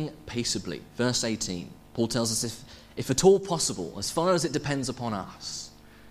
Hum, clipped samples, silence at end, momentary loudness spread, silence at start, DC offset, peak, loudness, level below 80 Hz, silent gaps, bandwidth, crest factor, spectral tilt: none; under 0.1%; 0 s; 15 LU; 0 s; under 0.1%; -6 dBFS; -28 LUFS; -54 dBFS; none; 15.5 kHz; 22 dB; -4 dB/octave